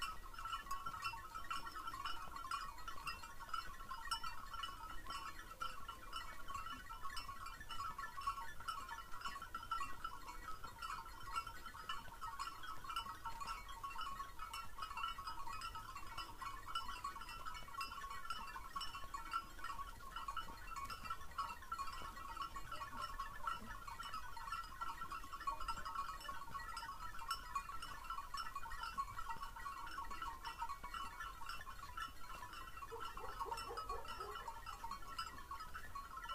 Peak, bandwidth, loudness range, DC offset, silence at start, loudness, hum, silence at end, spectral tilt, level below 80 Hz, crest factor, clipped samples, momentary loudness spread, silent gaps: -28 dBFS; 15.5 kHz; 2 LU; under 0.1%; 0 s; -48 LUFS; none; 0 s; -2 dB/octave; -58 dBFS; 18 dB; under 0.1%; 5 LU; none